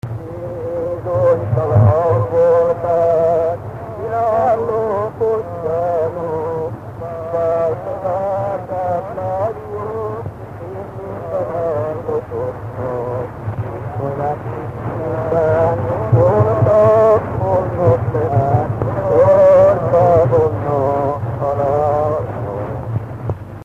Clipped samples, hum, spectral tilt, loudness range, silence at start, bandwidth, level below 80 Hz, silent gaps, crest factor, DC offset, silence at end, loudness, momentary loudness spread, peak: under 0.1%; none; -10 dB/octave; 10 LU; 0.05 s; 7.4 kHz; -40 dBFS; none; 16 dB; under 0.1%; 0 s; -17 LUFS; 14 LU; 0 dBFS